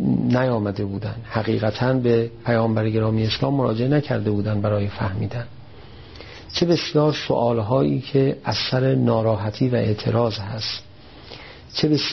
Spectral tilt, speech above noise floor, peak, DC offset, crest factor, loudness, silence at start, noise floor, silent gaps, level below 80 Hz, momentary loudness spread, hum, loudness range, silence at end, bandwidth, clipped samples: -6 dB/octave; 22 dB; -6 dBFS; 0.3%; 16 dB; -21 LUFS; 0 s; -42 dBFS; none; -48 dBFS; 10 LU; none; 3 LU; 0 s; 6.4 kHz; under 0.1%